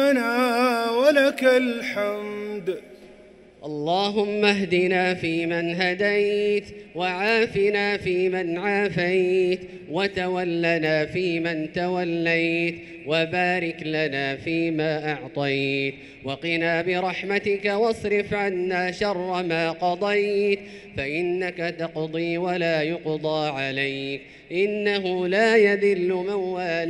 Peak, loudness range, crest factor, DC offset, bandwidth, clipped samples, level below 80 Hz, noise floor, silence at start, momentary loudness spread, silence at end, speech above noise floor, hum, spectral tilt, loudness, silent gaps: -6 dBFS; 3 LU; 18 dB; under 0.1%; 14.5 kHz; under 0.1%; -58 dBFS; -49 dBFS; 0 s; 9 LU; 0 s; 25 dB; none; -5.5 dB/octave; -23 LUFS; none